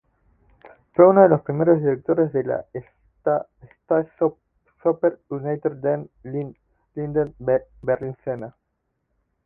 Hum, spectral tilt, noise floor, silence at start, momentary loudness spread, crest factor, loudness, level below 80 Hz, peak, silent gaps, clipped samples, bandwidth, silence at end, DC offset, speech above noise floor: none; -12.5 dB/octave; -75 dBFS; 0.65 s; 16 LU; 22 dB; -22 LUFS; -58 dBFS; 0 dBFS; none; under 0.1%; 2.8 kHz; 0.95 s; under 0.1%; 54 dB